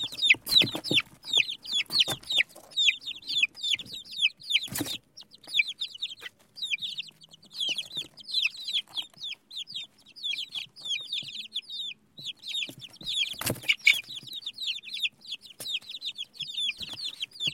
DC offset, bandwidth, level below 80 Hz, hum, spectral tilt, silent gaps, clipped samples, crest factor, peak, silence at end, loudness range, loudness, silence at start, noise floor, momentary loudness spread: under 0.1%; 16.5 kHz; -68 dBFS; none; -0.5 dB/octave; none; under 0.1%; 24 dB; -6 dBFS; 0 s; 8 LU; -28 LUFS; 0 s; -52 dBFS; 15 LU